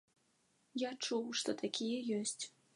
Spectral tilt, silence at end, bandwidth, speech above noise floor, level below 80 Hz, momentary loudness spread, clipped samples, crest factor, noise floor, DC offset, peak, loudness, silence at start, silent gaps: -3 dB/octave; 0.25 s; 11.5 kHz; 37 dB; -90 dBFS; 5 LU; under 0.1%; 20 dB; -76 dBFS; under 0.1%; -22 dBFS; -39 LUFS; 0.75 s; none